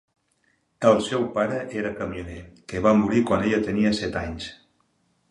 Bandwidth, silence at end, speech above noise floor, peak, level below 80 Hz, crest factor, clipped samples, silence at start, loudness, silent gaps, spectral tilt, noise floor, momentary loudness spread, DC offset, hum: 11 kHz; 0.75 s; 45 dB; -4 dBFS; -48 dBFS; 22 dB; under 0.1%; 0.8 s; -23 LUFS; none; -6 dB/octave; -68 dBFS; 16 LU; under 0.1%; none